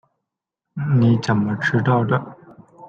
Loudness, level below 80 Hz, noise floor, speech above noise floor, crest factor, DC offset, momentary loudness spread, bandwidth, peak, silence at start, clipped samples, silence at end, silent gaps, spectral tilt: -19 LUFS; -56 dBFS; -83 dBFS; 65 dB; 16 dB; under 0.1%; 14 LU; 7.8 kHz; -6 dBFS; 0.75 s; under 0.1%; 0 s; none; -8 dB/octave